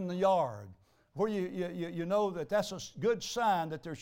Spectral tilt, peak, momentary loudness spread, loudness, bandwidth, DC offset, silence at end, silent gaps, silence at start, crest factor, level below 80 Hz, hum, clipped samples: -5.5 dB/octave; -16 dBFS; 9 LU; -33 LUFS; 16.5 kHz; under 0.1%; 0 s; none; 0 s; 16 dB; -68 dBFS; none; under 0.1%